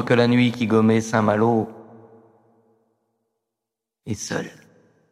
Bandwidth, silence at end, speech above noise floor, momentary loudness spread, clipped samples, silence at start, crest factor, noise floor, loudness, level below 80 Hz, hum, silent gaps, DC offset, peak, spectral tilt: 12.5 kHz; 0.6 s; 66 dB; 15 LU; under 0.1%; 0 s; 20 dB; -85 dBFS; -20 LUFS; -64 dBFS; none; none; under 0.1%; -2 dBFS; -6 dB/octave